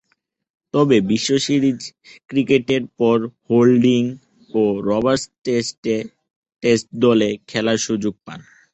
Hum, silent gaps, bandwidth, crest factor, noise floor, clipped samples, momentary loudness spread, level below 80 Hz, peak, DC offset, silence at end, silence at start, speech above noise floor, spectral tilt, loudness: none; 5.78-5.83 s, 6.36-6.42 s; 8.4 kHz; 16 dB; -69 dBFS; under 0.1%; 10 LU; -56 dBFS; -2 dBFS; under 0.1%; 0.35 s; 0.75 s; 51 dB; -5.5 dB/octave; -18 LUFS